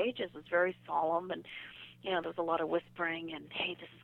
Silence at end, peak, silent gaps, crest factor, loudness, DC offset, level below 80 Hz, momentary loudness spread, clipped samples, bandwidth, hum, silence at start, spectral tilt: 0.05 s; -18 dBFS; none; 18 dB; -35 LUFS; under 0.1%; -74 dBFS; 11 LU; under 0.1%; 4.3 kHz; none; 0 s; -6.5 dB/octave